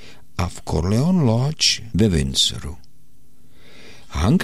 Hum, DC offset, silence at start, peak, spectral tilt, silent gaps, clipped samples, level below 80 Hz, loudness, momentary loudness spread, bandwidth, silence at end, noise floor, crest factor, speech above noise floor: none; 2%; 0.05 s; -4 dBFS; -4.5 dB/octave; none; under 0.1%; -34 dBFS; -19 LUFS; 15 LU; 15 kHz; 0 s; -56 dBFS; 16 dB; 37 dB